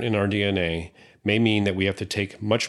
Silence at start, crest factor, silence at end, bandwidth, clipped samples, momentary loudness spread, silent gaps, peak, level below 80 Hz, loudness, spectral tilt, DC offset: 0 s; 18 dB; 0 s; 12 kHz; under 0.1%; 9 LU; none; -6 dBFS; -56 dBFS; -24 LUFS; -5.5 dB/octave; under 0.1%